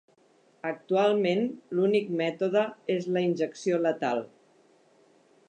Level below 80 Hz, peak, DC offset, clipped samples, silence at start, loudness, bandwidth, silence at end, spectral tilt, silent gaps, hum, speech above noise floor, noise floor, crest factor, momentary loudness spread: -82 dBFS; -14 dBFS; under 0.1%; under 0.1%; 0.65 s; -28 LUFS; 9.2 kHz; 1.25 s; -6.5 dB/octave; none; none; 36 dB; -63 dBFS; 16 dB; 9 LU